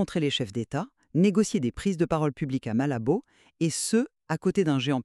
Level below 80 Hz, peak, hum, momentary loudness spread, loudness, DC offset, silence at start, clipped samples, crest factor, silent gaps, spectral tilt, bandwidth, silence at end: -56 dBFS; -10 dBFS; none; 7 LU; -27 LUFS; under 0.1%; 0 s; under 0.1%; 16 dB; none; -5.5 dB/octave; 13 kHz; 0 s